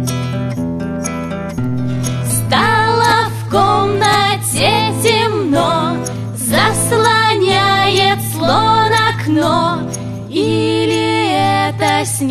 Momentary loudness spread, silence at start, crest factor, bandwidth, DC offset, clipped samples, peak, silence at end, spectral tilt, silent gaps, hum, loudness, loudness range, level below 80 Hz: 9 LU; 0 s; 14 dB; 14 kHz; under 0.1%; under 0.1%; 0 dBFS; 0 s; -4 dB/octave; none; none; -14 LUFS; 3 LU; -40 dBFS